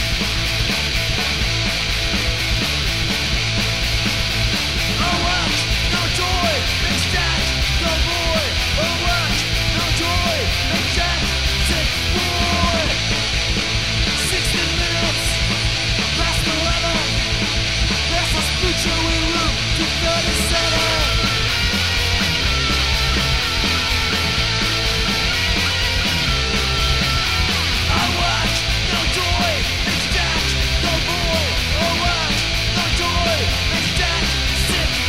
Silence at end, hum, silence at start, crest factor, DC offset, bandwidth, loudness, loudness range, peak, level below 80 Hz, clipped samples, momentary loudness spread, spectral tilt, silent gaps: 0 s; none; 0 s; 16 dB; 1%; 16 kHz; -17 LUFS; 1 LU; -2 dBFS; -26 dBFS; under 0.1%; 1 LU; -3 dB/octave; none